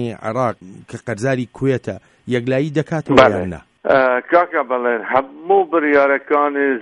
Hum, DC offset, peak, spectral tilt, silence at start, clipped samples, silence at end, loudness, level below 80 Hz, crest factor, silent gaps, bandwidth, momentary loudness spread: none; under 0.1%; 0 dBFS; -6.5 dB/octave; 0 s; under 0.1%; 0 s; -17 LUFS; -50 dBFS; 16 dB; none; 11 kHz; 13 LU